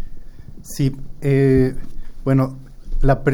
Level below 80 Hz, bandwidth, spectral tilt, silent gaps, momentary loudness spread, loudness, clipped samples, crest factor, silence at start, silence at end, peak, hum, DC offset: -26 dBFS; 17 kHz; -8 dB/octave; none; 24 LU; -19 LUFS; under 0.1%; 16 dB; 0 s; 0 s; -4 dBFS; none; under 0.1%